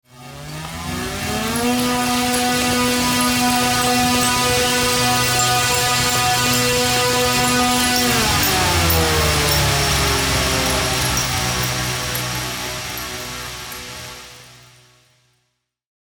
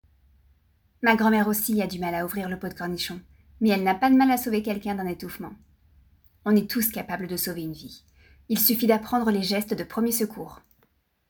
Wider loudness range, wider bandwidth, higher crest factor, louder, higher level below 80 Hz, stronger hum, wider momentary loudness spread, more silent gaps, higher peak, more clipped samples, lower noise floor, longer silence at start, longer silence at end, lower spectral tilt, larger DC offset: first, 10 LU vs 4 LU; about the same, over 20 kHz vs over 20 kHz; about the same, 16 dB vs 20 dB; first, -17 LUFS vs -24 LUFS; first, -34 dBFS vs -56 dBFS; neither; second, 12 LU vs 16 LU; neither; first, -2 dBFS vs -6 dBFS; neither; first, -71 dBFS vs -67 dBFS; second, 0.15 s vs 1 s; first, 1.5 s vs 0.75 s; second, -2.5 dB/octave vs -4.5 dB/octave; neither